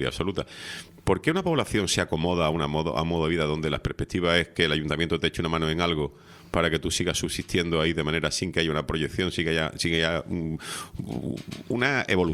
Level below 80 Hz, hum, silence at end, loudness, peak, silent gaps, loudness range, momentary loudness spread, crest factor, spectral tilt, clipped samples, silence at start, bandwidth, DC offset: -46 dBFS; none; 0 s; -26 LUFS; -6 dBFS; none; 2 LU; 9 LU; 20 dB; -4.5 dB/octave; under 0.1%; 0 s; 15 kHz; under 0.1%